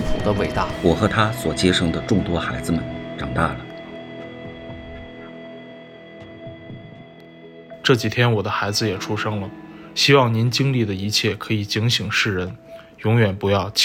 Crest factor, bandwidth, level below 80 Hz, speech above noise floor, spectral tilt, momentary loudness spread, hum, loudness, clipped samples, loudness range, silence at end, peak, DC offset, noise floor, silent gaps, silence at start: 20 dB; 16.5 kHz; -40 dBFS; 23 dB; -5 dB/octave; 20 LU; none; -20 LUFS; under 0.1%; 17 LU; 0 s; -2 dBFS; under 0.1%; -42 dBFS; none; 0 s